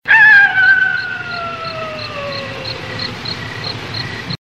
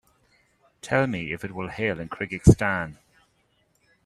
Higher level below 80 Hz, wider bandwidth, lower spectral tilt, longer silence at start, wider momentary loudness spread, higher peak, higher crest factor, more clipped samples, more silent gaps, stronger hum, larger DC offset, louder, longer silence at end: second, -48 dBFS vs -38 dBFS; about the same, 11.5 kHz vs 12.5 kHz; second, -3.5 dB/octave vs -6.5 dB/octave; second, 0.05 s vs 0.85 s; first, 17 LU vs 14 LU; about the same, 0 dBFS vs -2 dBFS; second, 16 dB vs 24 dB; neither; neither; neither; first, 0.3% vs under 0.1%; first, -14 LUFS vs -24 LUFS; second, 0.05 s vs 1.1 s